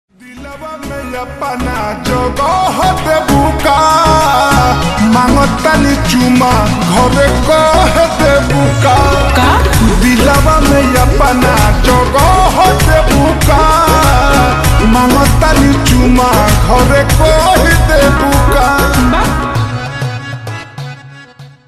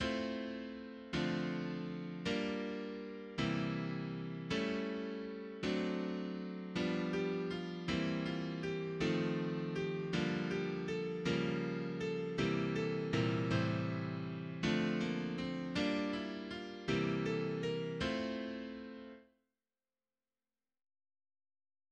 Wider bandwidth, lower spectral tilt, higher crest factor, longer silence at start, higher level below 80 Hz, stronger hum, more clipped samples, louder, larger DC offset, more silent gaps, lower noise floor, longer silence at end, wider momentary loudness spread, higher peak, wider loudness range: first, 15 kHz vs 9 kHz; second, -5 dB/octave vs -6.5 dB/octave; second, 8 dB vs 16 dB; first, 0.25 s vs 0 s; first, -16 dBFS vs -64 dBFS; neither; neither; first, -9 LUFS vs -39 LUFS; neither; neither; second, -34 dBFS vs under -90 dBFS; second, 0.2 s vs 2.7 s; first, 11 LU vs 8 LU; first, 0 dBFS vs -22 dBFS; about the same, 3 LU vs 4 LU